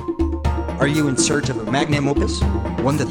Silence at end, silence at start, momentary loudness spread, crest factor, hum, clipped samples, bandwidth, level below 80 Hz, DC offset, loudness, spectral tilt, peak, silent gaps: 0 s; 0 s; 5 LU; 16 dB; none; under 0.1%; 17.5 kHz; -28 dBFS; under 0.1%; -20 LUFS; -5 dB/octave; -4 dBFS; none